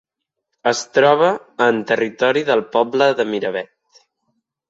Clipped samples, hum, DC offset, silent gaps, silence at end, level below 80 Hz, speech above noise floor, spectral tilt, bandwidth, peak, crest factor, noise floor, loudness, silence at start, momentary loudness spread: under 0.1%; none; under 0.1%; none; 1.05 s; -68 dBFS; 61 dB; -4 dB/octave; 8 kHz; -2 dBFS; 18 dB; -77 dBFS; -17 LUFS; 0.65 s; 9 LU